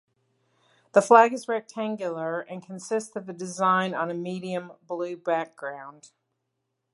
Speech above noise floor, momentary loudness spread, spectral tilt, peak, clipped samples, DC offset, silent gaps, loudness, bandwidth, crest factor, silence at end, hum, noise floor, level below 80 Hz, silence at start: 54 dB; 19 LU; -5 dB/octave; -2 dBFS; under 0.1%; under 0.1%; none; -25 LUFS; 11.5 kHz; 24 dB; 0.9 s; none; -80 dBFS; -80 dBFS; 0.95 s